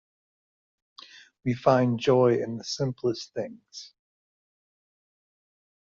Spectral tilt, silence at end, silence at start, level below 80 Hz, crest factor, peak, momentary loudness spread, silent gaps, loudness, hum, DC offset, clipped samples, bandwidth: -6 dB/octave; 2.1 s; 1.45 s; -66 dBFS; 24 dB; -6 dBFS; 18 LU; none; -26 LUFS; none; under 0.1%; under 0.1%; 7.6 kHz